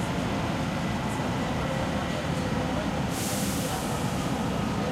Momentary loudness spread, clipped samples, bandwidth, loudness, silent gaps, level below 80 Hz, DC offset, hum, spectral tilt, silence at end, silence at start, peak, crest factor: 1 LU; under 0.1%; 16 kHz; -29 LUFS; none; -42 dBFS; under 0.1%; none; -5 dB/octave; 0 s; 0 s; -16 dBFS; 12 dB